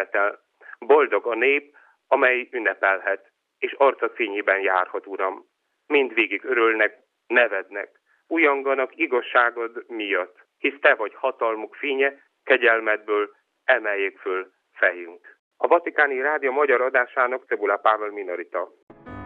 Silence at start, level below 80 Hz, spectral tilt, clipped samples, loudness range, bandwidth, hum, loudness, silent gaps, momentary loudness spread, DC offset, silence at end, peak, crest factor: 0 s; -70 dBFS; -6 dB/octave; under 0.1%; 2 LU; 4.2 kHz; none; -22 LUFS; 15.39-15.51 s, 18.83-18.87 s; 12 LU; under 0.1%; 0 s; -4 dBFS; 20 dB